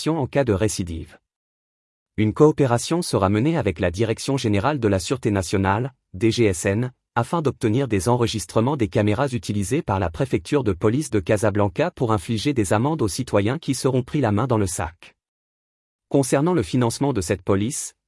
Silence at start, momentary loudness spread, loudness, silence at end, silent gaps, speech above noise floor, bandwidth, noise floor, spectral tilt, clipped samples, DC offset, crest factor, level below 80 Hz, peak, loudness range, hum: 0 s; 5 LU; -22 LUFS; 0.15 s; 1.36-2.06 s, 15.28-15.99 s; over 69 dB; 12 kHz; under -90 dBFS; -6 dB/octave; under 0.1%; under 0.1%; 18 dB; -48 dBFS; -4 dBFS; 2 LU; none